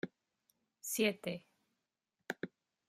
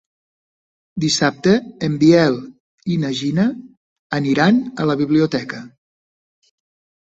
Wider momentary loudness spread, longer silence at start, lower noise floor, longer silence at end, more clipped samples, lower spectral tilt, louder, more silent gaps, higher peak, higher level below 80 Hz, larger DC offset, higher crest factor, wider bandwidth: about the same, 14 LU vs 15 LU; second, 0.05 s vs 0.95 s; about the same, -88 dBFS vs under -90 dBFS; second, 0.4 s vs 1.35 s; neither; second, -3.5 dB/octave vs -5.5 dB/octave; second, -40 LUFS vs -17 LUFS; second, none vs 2.60-2.78 s, 3.77-4.10 s; second, -18 dBFS vs -2 dBFS; second, -84 dBFS vs -56 dBFS; neither; first, 24 dB vs 18 dB; first, 15.5 kHz vs 8.2 kHz